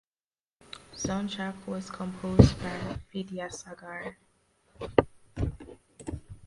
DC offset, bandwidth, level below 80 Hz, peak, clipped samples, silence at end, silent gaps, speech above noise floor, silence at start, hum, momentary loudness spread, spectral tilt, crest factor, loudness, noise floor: under 0.1%; 11.5 kHz; -42 dBFS; 0 dBFS; under 0.1%; 0.1 s; none; over 62 dB; 0.9 s; none; 22 LU; -6.5 dB/octave; 30 dB; -30 LUFS; under -90 dBFS